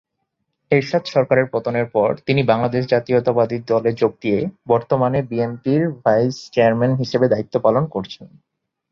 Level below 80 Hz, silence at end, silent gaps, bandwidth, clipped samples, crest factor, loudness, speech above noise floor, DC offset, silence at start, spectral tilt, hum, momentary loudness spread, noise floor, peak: -56 dBFS; 0.65 s; none; 7.2 kHz; under 0.1%; 16 dB; -19 LUFS; 56 dB; under 0.1%; 0.7 s; -7.5 dB/octave; none; 5 LU; -74 dBFS; -2 dBFS